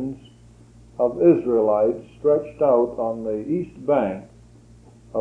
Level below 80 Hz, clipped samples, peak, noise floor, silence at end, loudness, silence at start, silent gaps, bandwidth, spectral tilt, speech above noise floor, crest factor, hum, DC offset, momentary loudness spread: -54 dBFS; under 0.1%; -4 dBFS; -48 dBFS; 0 s; -21 LUFS; 0 s; none; 7 kHz; -9.5 dB/octave; 28 dB; 18 dB; none; under 0.1%; 14 LU